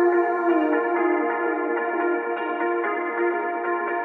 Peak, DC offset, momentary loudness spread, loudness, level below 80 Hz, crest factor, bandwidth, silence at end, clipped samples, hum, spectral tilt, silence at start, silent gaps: -10 dBFS; under 0.1%; 4 LU; -23 LUFS; -84 dBFS; 14 dB; 3.7 kHz; 0 s; under 0.1%; none; -6.5 dB/octave; 0 s; none